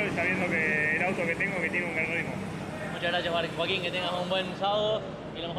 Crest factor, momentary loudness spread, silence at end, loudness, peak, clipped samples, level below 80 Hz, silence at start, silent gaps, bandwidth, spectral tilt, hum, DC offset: 16 dB; 10 LU; 0 s; -28 LUFS; -14 dBFS; under 0.1%; -58 dBFS; 0 s; none; 14.5 kHz; -5 dB/octave; none; under 0.1%